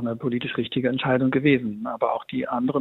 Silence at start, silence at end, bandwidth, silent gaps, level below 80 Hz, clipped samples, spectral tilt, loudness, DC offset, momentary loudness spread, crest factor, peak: 0 s; 0 s; 4.1 kHz; none; -62 dBFS; under 0.1%; -9 dB/octave; -24 LUFS; under 0.1%; 7 LU; 16 dB; -8 dBFS